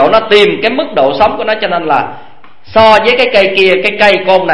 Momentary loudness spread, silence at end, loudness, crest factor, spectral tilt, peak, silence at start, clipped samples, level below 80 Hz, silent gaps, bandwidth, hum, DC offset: 7 LU; 0 s; -8 LUFS; 10 dB; -5 dB/octave; 0 dBFS; 0 s; 1%; -42 dBFS; none; 11 kHz; none; 4%